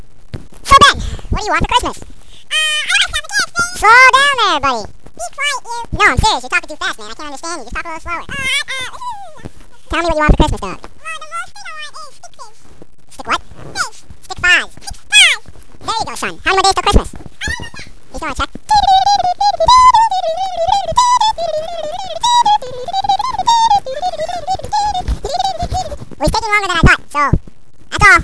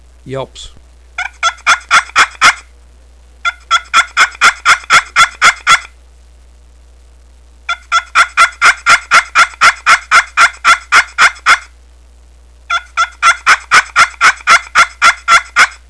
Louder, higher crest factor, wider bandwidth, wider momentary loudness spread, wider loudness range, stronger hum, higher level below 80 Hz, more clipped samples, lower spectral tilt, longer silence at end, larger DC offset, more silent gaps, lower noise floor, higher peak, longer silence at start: second, -13 LUFS vs -9 LUFS; about the same, 14 dB vs 12 dB; about the same, 11 kHz vs 11 kHz; first, 20 LU vs 12 LU; first, 8 LU vs 5 LU; neither; first, -26 dBFS vs -40 dBFS; second, 0.4% vs 1%; first, -2.5 dB/octave vs 0.5 dB/octave; second, 0 s vs 0.15 s; first, 4% vs 0.4%; neither; about the same, -38 dBFS vs -41 dBFS; about the same, 0 dBFS vs 0 dBFS; about the same, 0.35 s vs 0.25 s